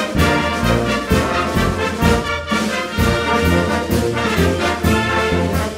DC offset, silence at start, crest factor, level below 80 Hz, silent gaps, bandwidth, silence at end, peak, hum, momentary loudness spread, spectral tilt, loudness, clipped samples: under 0.1%; 0 s; 14 dB; -28 dBFS; none; 16.5 kHz; 0 s; -2 dBFS; none; 3 LU; -5 dB/octave; -17 LUFS; under 0.1%